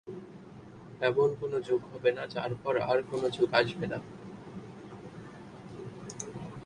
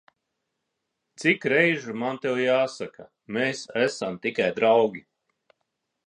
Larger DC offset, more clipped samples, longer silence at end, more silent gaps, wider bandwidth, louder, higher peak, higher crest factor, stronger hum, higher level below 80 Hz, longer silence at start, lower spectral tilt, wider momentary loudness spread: neither; neither; second, 0 s vs 1.1 s; neither; about the same, 11 kHz vs 10.5 kHz; second, -31 LUFS vs -24 LUFS; second, -10 dBFS vs -6 dBFS; about the same, 22 dB vs 22 dB; neither; first, -64 dBFS vs -74 dBFS; second, 0.05 s vs 1.2 s; about the same, -5 dB/octave vs -5 dB/octave; first, 20 LU vs 10 LU